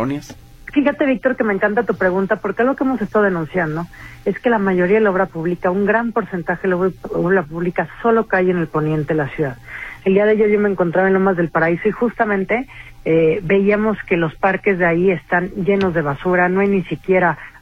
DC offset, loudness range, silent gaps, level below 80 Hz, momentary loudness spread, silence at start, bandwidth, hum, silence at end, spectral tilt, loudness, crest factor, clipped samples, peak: under 0.1%; 2 LU; none; -44 dBFS; 7 LU; 0 s; 7.6 kHz; none; 0.1 s; -8.5 dB/octave; -17 LUFS; 14 dB; under 0.1%; -2 dBFS